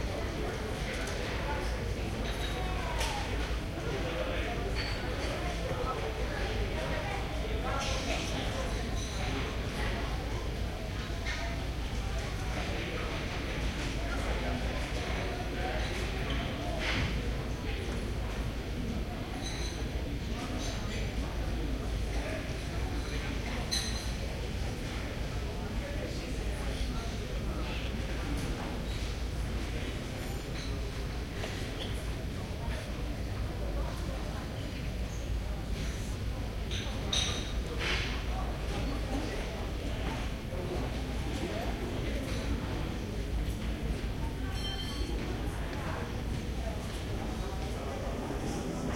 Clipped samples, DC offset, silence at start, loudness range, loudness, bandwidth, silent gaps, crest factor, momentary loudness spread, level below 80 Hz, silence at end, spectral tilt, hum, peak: under 0.1%; under 0.1%; 0 s; 3 LU; -36 LUFS; 16.5 kHz; none; 16 dB; 4 LU; -38 dBFS; 0 s; -5 dB/octave; none; -18 dBFS